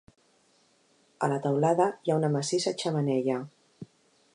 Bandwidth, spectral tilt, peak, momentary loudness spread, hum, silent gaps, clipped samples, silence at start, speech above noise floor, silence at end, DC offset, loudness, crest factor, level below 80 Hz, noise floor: 11 kHz; -5.5 dB/octave; -12 dBFS; 24 LU; none; none; under 0.1%; 1.2 s; 39 dB; 0.5 s; under 0.1%; -28 LUFS; 18 dB; -76 dBFS; -66 dBFS